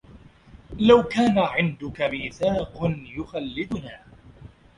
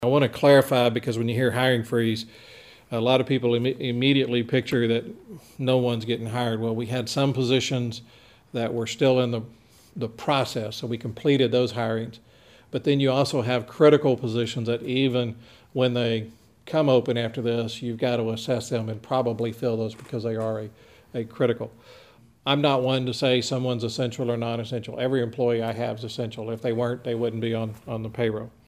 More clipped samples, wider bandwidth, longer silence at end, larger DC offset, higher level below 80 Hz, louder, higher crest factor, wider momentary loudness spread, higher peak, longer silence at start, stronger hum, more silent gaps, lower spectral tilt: neither; second, 11 kHz vs 15.5 kHz; about the same, 0.3 s vs 0.2 s; neither; first, -48 dBFS vs -62 dBFS; about the same, -23 LUFS vs -25 LUFS; about the same, 20 dB vs 20 dB; first, 16 LU vs 11 LU; about the same, -4 dBFS vs -6 dBFS; about the same, 0.1 s vs 0 s; neither; neither; about the same, -6.5 dB/octave vs -6 dB/octave